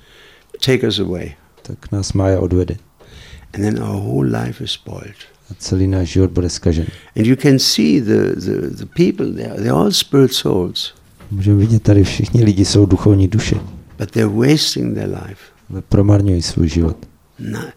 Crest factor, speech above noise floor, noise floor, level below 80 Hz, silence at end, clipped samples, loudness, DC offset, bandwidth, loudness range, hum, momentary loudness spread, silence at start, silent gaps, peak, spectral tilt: 16 dB; 31 dB; -46 dBFS; -34 dBFS; 0.05 s; under 0.1%; -15 LUFS; 0.1%; 16 kHz; 6 LU; none; 16 LU; 0.6 s; none; 0 dBFS; -6 dB/octave